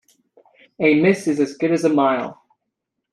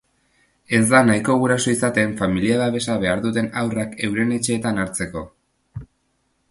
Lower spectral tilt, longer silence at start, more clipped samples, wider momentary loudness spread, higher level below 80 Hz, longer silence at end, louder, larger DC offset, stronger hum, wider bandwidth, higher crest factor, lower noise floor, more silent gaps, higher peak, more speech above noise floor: first, -6.5 dB/octave vs -5 dB/octave; about the same, 0.8 s vs 0.7 s; neither; second, 7 LU vs 17 LU; second, -66 dBFS vs -48 dBFS; first, 0.8 s vs 0.65 s; about the same, -18 LUFS vs -20 LUFS; neither; neither; about the same, 12 kHz vs 11.5 kHz; about the same, 18 dB vs 20 dB; first, -79 dBFS vs -68 dBFS; neither; about the same, -2 dBFS vs 0 dBFS; first, 61 dB vs 48 dB